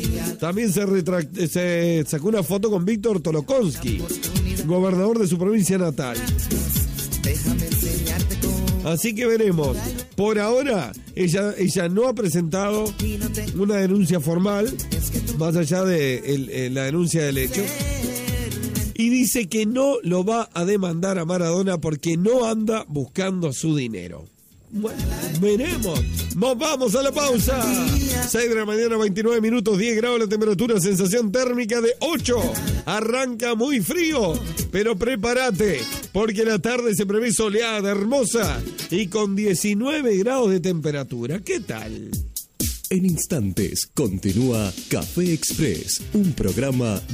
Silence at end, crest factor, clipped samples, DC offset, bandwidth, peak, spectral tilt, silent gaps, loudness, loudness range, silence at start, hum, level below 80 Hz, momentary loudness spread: 0 s; 14 dB; under 0.1%; under 0.1%; 16 kHz; -8 dBFS; -5 dB/octave; none; -22 LUFS; 3 LU; 0 s; none; -36 dBFS; 6 LU